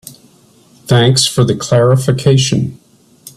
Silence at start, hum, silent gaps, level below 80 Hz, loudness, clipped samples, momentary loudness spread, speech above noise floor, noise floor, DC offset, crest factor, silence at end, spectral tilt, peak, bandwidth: 0.05 s; none; none; -44 dBFS; -12 LUFS; under 0.1%; 5 LU; 36 dB; -47 dBFS; under 0.1%; 14 dB; 0.1 s; -5 dB/octave; 0 dBFS; 13.5 kHz